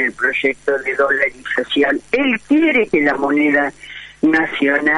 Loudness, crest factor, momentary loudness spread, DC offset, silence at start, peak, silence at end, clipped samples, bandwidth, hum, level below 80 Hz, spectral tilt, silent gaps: -16 LUFS; 14 dB; 5 LU; under 0.1%; 0 s; -2 dBFS; 0 s; under 0.1%; 11 kHz; none; -52 dBFS; -5 dB/octave; none